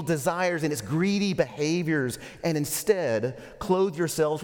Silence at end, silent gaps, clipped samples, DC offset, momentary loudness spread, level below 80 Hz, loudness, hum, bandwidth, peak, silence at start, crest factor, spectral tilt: 0 s; none; under 0.1%; under 0.1%; 5 LU; -56 dBFS; -26 LUFS; none; 18 kHz; -8 dBFS; 0 s; 18 dB; -5 dB/octave